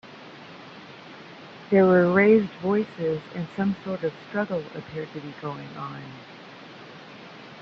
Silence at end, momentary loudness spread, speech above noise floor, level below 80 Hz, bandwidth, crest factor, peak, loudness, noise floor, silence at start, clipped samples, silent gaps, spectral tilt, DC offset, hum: 0 s; 25 LU; 20 dB; -66 dBFS; 6.6 kHz; 18 dB; -8 dBFS; -24 LUFS; -44 dBFS; 0.05 s; under 0.1%; none; -8.5 dB/octave; under 0.1%; none